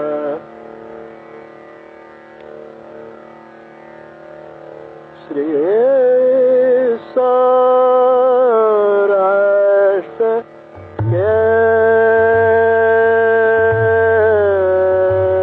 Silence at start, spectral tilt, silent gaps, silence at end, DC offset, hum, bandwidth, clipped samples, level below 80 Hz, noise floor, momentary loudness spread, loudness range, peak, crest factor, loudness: 0 s; -9.5 dB/octave; none; 0 s; under 0.1%; none; 4.2 kHz; under 0.1%; -52 dBFS; -38 dBFS; 14 LU; 8 LU; -4 dBFS; 10 dB; -13 LUFS